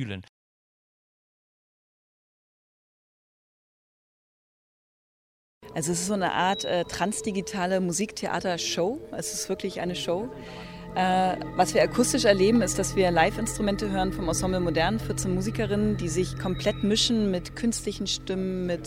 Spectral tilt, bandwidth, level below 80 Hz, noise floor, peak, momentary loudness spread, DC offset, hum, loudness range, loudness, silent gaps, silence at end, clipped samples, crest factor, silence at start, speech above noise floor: -4 dB/octave; 16 kHz; -46 dBFS; under -90 dBFS; -6 dBFS; 9 LU; under 0.1%; none; 7 LU; -26 LUFS; 0.29-5.61 s; 0 s; under 0.1%; 22 dB; 0 s; over 64 dB